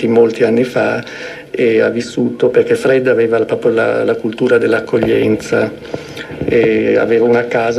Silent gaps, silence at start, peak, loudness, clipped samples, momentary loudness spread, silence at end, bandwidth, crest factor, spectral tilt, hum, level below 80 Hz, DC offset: none; 0 s; 0 dBFS; -13 LUFS; under 0.1%; 10 LU; 0 s; 12 kHz; 12 dB; -6.5 dB/octave; none; -48 dBFS; under 0.1%